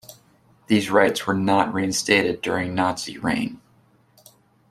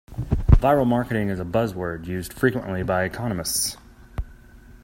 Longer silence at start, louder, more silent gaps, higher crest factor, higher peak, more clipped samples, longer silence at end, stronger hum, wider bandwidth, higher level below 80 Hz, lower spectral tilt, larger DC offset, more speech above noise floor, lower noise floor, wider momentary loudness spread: about the same, 0.1 s vs 0.1 s; about the same, -21 LUFS vs -23 LUFS; neither; about the same, 20 dB vs 22 dB; about the same, -2 dBFS vs 0 dBFS; neither; first, 1.15 s vs 0.05 s; neither; about the same, 15 kHz vs 16.5 kHz; second, -58 dBFS vs -30 dBFS; second, -4 dB/octave vs -5.5 dB/octave; neither; first, 37 dB vs 23 dB; first, -58 dBFS vs -47 dBFS; second, 6 LU vs 18 LU